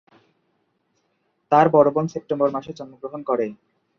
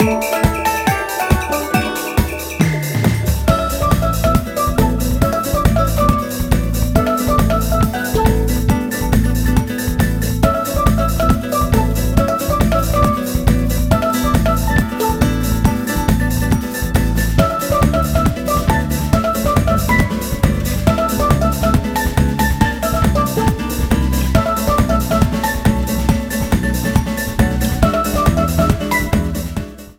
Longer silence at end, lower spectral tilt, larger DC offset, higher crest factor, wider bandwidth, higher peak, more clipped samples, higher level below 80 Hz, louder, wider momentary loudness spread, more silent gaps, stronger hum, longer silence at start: first, 0.45 s vs 0.05 s; first, -8 dB/octave vs -6 dB/octave; neither; first, 20 dB vs 14 dB; second, 6.8 kHz vs 17.5 kHz; about the same, -2 dBFS vs 0 dBFS; neither; second, -64 dBFS vs -20 dBFS; second, -20 LUFS vs -16 LUFS; first, 18 LU vs 3 LU; neither; neither; first, 1.5 s vs 0 s